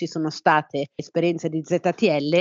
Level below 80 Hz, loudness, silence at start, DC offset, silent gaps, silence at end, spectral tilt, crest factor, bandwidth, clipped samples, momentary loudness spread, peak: -72 dBFS; -23 LUFS; 0 s; under 0.1%; none; 0 s; -6 dB/octave; 20 dB; 7.6 kHz; under 0.1%; 8 LU; -4 dBFS